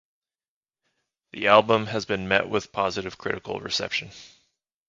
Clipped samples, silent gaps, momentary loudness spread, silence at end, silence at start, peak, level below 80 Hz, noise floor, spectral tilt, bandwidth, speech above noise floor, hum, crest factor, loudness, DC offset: under 0.1%; none; 13 LU; 0.6 s; 1.35 s; -2 dBFS; -58 dBFS; under -90 dBFS; -4 dB/octave; 7.8 kHz; over 66 dB; none; 24 dB; -24 LUFS; under 0.1%